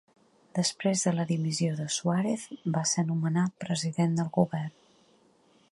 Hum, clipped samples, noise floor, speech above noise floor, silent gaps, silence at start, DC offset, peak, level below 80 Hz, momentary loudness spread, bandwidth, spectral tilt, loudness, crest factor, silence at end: none; under 0.1%; -63 dBFS; 35 dB; none; 0.55 s; under 0.1%; -10 dBFS; -72 dBFS; 5 LU; 11.5 kHz; -5 dB/octave; -29 LUFS; 20 dB; 1 s